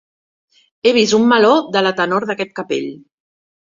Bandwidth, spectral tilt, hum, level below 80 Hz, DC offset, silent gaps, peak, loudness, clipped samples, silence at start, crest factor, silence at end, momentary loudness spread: 7.6 kHz; -4 dB/octave; none; -60 dBFS; under 0.1%; none; -2 dBFS; -15 LUFS; under 0.1%; 0.85 s; 16 dB; 0.75 s; 11 LU